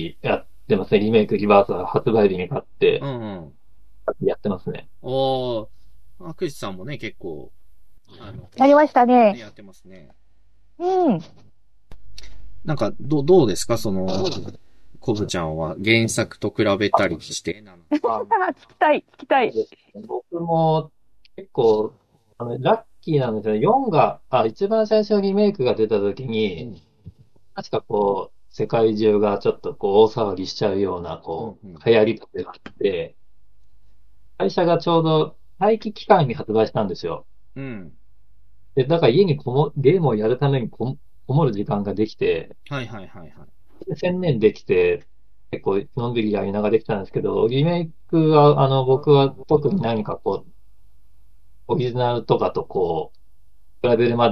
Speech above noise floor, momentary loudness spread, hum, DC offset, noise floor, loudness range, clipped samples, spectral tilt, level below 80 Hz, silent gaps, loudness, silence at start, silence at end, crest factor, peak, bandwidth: 41 dB; 16 LU; none; 1%; -60 dBFS; 6 LU; under 0.1%; -6.5 dB/octave; -54 dBFS; none; -20 LUFS; 0 s; 0 s; 22 dB; 0 dBFS; 13 kHz